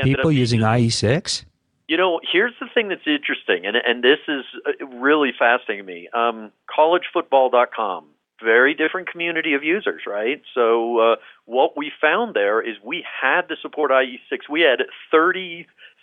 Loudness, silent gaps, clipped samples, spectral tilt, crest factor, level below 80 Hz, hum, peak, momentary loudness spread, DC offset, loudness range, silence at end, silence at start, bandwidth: -20 LUFS; none; under 0.1%; -5 dB/octave; 18 dB; -56 dBFS; none; -2 dBFS; 10 LU; under 0.1%; 1 LU; 0.15 s; 0 s; 10.5 kHz